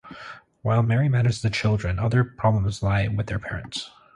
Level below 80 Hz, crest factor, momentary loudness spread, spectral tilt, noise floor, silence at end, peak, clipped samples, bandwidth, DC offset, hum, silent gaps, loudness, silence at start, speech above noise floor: -40 dBFS; 16 dB; 12 LU; -6.5 dB/octave; -43 dBFS; 0.3 s; -8 dBFS; under 0.1%; 10 kHz; under 0.1%; none; none; -24 LUFS; 0.05 s; 21 dB